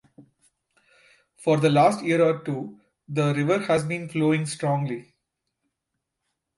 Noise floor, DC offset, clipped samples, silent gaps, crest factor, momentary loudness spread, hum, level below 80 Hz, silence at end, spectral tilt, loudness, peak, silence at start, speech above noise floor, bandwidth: -82 dBFS; under 0.1%; under 0.1%; none; 18 dB; 12 LU; none; -66 dBFS; 1.55 s; -6.5 dB/octave; -23 LUFS; -8 dBFS; 0.2 s; 59 dB; 11.5 kHz